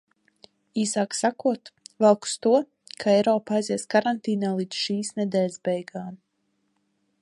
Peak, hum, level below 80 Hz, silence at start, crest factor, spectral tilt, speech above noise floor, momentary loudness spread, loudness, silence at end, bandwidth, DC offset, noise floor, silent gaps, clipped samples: -6 dBFS; none; -74 dBFS; 0.75 s; 20 dB; -4.5 dB/octave; 49 dB; 11 LU; -24 LUFS; 1.05 s; 11.5 kHz; under 0.1%; -73 dBFS; none; under 0.1%